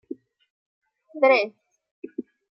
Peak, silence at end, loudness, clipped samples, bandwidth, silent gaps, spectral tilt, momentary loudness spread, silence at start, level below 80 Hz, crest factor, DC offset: -6 dBFS; 0.35 s; -21 LUFS; under 0.1%; 6 kHz; 1.91-2.03 s; -5 dB/octave; 24 LU; 1.15 s; -86 dBFS; 20 dB; under 0.1%